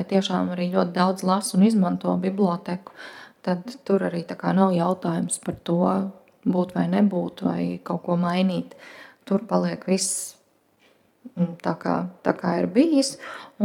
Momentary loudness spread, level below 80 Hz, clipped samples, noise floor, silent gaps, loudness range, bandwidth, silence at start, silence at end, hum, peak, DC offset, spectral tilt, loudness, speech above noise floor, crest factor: 13 LU; -68 dBFS; under 0.1%; -62 dBFS; none; 3 LU; 15 kHz; 0 s; 0 s; none; -4 dBFS; under 0.1%; -6 dB/octave; -24 LUFS; 38 dB; 18 dB